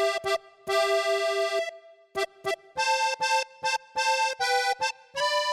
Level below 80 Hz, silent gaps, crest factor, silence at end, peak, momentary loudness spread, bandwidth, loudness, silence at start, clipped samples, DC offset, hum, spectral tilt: -70 dBFS; none; 14 dB; 0 s; -14 dBFS; 7 LU; 16.5 kHz; -27 LUFS; 0 s; under 0.1%; under 0.1%; none; -0.5 dB/octave